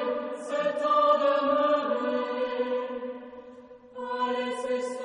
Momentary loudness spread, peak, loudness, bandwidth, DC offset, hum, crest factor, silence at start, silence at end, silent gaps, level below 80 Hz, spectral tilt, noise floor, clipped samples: 17 LU; -12 dBFS; -27 LUFS; 10 kHz; under 0.1%; none; 16 dB; 0 s; 0 s; none; -74 dBFS; -4 dB/octave; -48 dBFS; under 0.1%